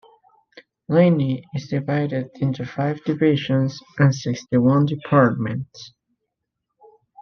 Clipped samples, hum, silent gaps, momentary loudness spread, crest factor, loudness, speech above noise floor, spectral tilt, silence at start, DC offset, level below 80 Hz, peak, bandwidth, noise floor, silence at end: under 0.1%; none; none; 10 LU; 18 dB; -21 LUFS; 60 dB; -7.5 dB/octave; 0.9 s; under 0.1%; -60 dBFS; -2 dBFS; 6.8 kHz; -80 dBFS; 0 s